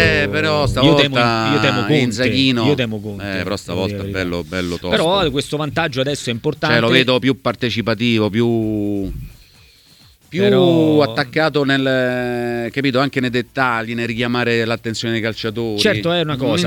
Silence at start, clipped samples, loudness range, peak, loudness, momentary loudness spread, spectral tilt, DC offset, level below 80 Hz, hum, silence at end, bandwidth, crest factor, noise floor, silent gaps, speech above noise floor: 0 s; under 0.1%; 4 LU; 0 dBFS; -17 LUFS; 9 LU; -5.5 dB/octave; under 0.1%; -40 dBFS; none; 0 s; 19 kHz; 16 dB; -48 dBFS; none; 32 dB